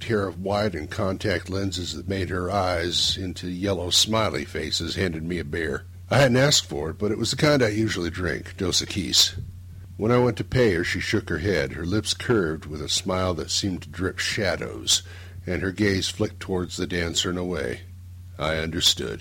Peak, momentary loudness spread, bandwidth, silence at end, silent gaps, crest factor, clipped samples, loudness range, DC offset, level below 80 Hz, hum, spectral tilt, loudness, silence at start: -6 dBFS; 10 LU; 16.5 kHz; 0 s; none; 18 dB; under 0.1%; 3 LU; under 0.1%; -44 dBFS; none; -3.5 dB/octave; -24 LUFS; 0 s